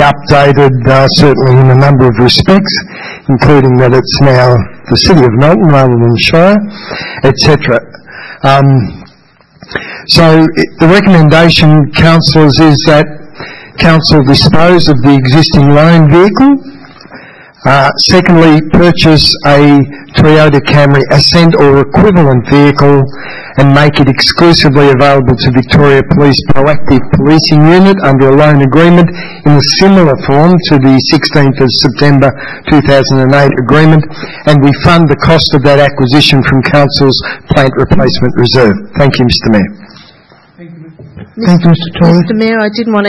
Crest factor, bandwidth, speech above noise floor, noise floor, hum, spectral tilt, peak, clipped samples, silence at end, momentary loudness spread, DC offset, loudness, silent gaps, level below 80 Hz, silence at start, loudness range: 6 dB; 12 kHz; 38 dB; -43 dBFS; none; -6.5 dB/octave; 0 dBFS; 7%; 0 s; 7 LU; under 0.1%; -6 LUFS; none; -28 dBFS; 0 s; 4 LU